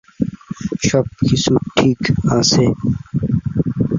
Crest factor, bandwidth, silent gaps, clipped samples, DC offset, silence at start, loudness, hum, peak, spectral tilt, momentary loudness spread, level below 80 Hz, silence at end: 14 dB; 7.6 kHz; none; under 0.1%; under 0.1%; 0.2 s; -17 LUFS; none; -2 dBFS; -5.5 dB/octave; 10 LU; -38 dBFS; 0 s